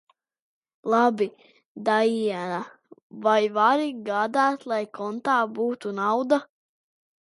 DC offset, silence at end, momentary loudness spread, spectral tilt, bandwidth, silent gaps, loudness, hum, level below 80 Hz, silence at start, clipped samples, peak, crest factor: under 0.1%; 0.8 s; 9 LU; -5 dB/octave; 11.5 kHz; 1.66-1.75 s, 3.02-3.10 s; -24 LUFS; none; -78 dBFS; 0.85 s; under 0.1%; -8 dBFS; 18 dB